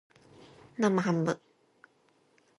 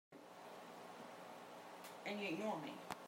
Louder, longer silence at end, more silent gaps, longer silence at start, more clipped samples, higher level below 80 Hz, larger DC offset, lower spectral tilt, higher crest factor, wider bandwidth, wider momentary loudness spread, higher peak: first, -30 LUFS vs -49 LUFS; first, 1.2 s vs 0 s; neither; first, 0.8 s vs 0.1 s; neither; first, -76 dBFS vs under -90 dBFS; neither; first, -6.5 dB/octave vs -4.5 dB/octave; about the same, 20 dB vs 24 dB; second, 11 kHz vs 16 kHz; about the same, 13 LU vs 13 LU; first, -14 dBFS vs -26 dBFS